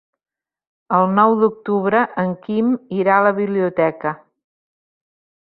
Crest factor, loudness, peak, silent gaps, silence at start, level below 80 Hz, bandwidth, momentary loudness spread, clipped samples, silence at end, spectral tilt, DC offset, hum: 18 dB; -18 LUFS; -2 dBFS; none; 0.9 s; -66 dBFS; 4.7 kHz; 8 LU; under 0.1%; 1.35 s; -12 dB/octave; under 0.1%; none